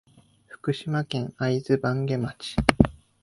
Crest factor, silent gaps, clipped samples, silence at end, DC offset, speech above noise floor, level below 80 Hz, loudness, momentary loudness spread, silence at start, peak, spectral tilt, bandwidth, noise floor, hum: 26 dB; none; under 0.1%; 0.3 s; under 0.1%; 27 dB; -40 dBFS; -26 LUFS; 8 LU; 0.5 s; 0 dBFS; -6.5 dB/octave; 11.5 kHz; -53 dBFS; none